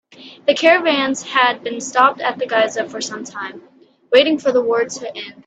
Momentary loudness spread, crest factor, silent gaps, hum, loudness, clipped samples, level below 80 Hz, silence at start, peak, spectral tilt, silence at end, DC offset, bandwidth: 14 LU; 18 dB; none; none; -17 LUFS; under 0.1%; -66 dBFS; 0.2 s; 0 dBFS; -2 dB/octave; 0.15 s; under 0.1%; 9 kHz